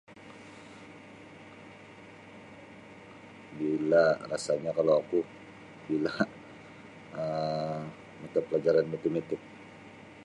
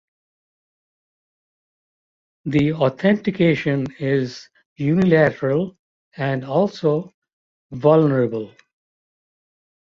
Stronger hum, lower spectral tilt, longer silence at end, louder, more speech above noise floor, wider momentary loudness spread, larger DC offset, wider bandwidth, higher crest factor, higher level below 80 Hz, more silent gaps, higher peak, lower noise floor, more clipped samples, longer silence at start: neither; second, -6 dB/octave vs -8.5 dB/octave; second, 0 s vs 1.35 s; second, -30 LUFS vs -20 LUFS; second, 22 dB vs over 71 dB; first, 23 LU vs 14 LU; neither; first, 11 kHz vs 7.4 kHz; about the same, 20 dB vs 18 dB; second, -70 dBFS vs -56 dBFS; second, none vs 4.66-4.76 s, 5.79-6.12 s, 7.14-7.22 s, 7.33-7.70 s; second, -12 dBFS vs -2 dBFS; second, -50 dBFS vs under -90 dBFS; neither; second, 0.1 s vs 2.45 s